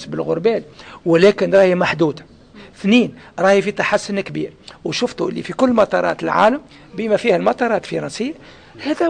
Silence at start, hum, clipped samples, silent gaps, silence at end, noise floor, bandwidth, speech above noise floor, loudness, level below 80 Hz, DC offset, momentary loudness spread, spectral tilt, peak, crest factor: 0 s; none; under 0.1%; none; 0 s; -42 dBFS; 9.8 kHz; 25 dB; -17 LUFS; -54 dBFS; under 0.1%; 13 LU; -5.5 dB/octave; -4 dBFS; 14 dB